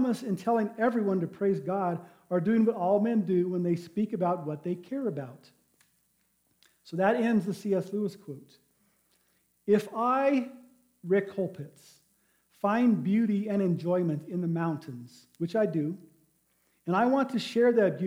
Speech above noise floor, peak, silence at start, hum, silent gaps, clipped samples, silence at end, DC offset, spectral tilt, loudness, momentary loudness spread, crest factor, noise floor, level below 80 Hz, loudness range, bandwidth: 44 dB; -12 dBFS; 0 s; none; none; under 0.1%; 0 s; under 0.1%; -8 dB/octave; -29 LUFS; 14 LU; 18 dB; -72 dBFS; -78 dBFS; 4 LU; 16 kHz